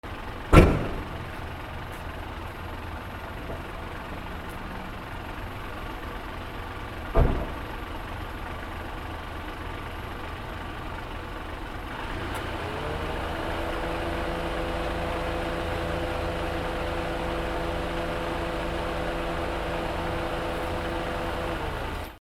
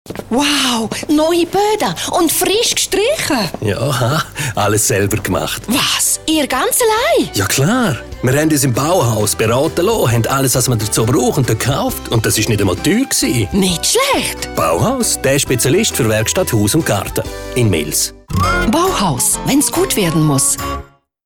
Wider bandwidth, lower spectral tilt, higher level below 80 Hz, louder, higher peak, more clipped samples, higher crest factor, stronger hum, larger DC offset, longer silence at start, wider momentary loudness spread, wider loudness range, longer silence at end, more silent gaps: second, 16.5 kHz vs over 20 kHz; first, -6 dB/octave vs -4 dB/octave; about the same, -34 dBFS vs -36 dBFS; second, -31 LUFS vs -14 LUFS; about the same, -2 dBFS vs -4 dBFS; neither; first, 28 dB vs 12 dB; neither; neither; about the same, 0.05 s vs 0.05 s; about the same, 7 LU vs 5 LU; first, 7 LU vs 1 LU; second, 0.05 s vs 0.4 s; neither